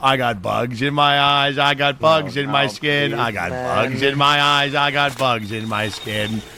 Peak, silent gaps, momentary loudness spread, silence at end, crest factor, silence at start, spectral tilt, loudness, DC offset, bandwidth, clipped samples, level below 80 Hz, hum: -2 dBFS; none; 8 LU; 0 s; 16 dB; 0 s; -4.5 dB/octave; -18 LUFS; under 0.1%; 17.5 kHz; under 0.1%; -50 dBFS; none